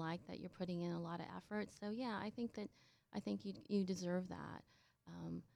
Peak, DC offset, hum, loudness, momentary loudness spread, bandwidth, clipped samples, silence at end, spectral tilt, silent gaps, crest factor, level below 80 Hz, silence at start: -28 dBFS; under 0.1%; none; -46 LUFS; 11 LU; 11.5 kHz; under 0.1%; 0.15 s; -6.5 dB/octave; none; 18 dB; -76 dBFS; 0 s